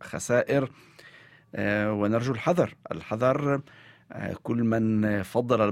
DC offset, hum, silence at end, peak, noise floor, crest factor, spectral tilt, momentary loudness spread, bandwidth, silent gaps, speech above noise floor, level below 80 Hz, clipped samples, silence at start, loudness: under 0.1%; none; 0 s; -8 dBFS; -53 dBFS; 18 dB; -6.5 dB/octave; 12 LU; 15.5 kHz; none; 27 dB; -60 dBFS; under 0.1%; 0 s; -27 LUFS